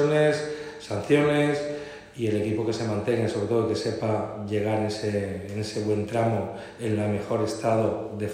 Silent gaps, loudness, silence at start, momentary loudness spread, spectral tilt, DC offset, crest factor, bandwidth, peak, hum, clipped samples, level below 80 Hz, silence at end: none; -26 LUFS; 0 s; 10 LU; -6.5 dB/octave; under 0.1%; 18 dB; 14.5 kHz; -8 dBFS; none; under 0.1%; -60 dBFS; 0 s